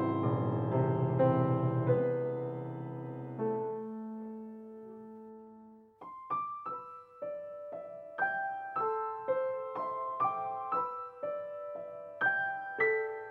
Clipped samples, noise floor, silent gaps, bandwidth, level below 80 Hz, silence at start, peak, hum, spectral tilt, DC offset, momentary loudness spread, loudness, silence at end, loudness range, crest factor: under 0.1%; -56 dBFS; none; 4.3 kHz; -72 dBFS; 0 s; -16 dBFS; none; -10.5 dB/octave; under 0.1%; 18 LU; -34 LUFS; 0 s; 11 LU; 18 dB